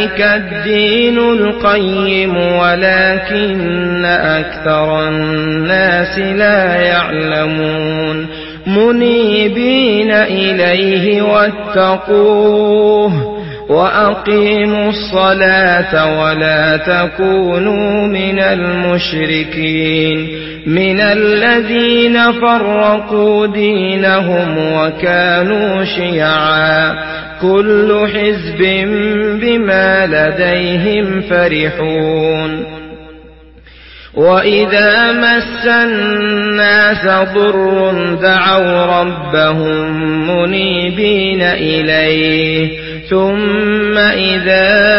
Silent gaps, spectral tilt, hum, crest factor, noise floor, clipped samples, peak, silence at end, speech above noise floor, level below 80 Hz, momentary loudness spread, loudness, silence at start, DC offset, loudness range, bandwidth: none; -9.5 dB/octave; none; 12 dB; -38 dBFS; under 0.1%; 0 dBFS; 0 s; 27 dB; -38 dBFS; 6 LU; -11 LUFS; 0 s; under 0.1%; 2 LU; 5.8 kHz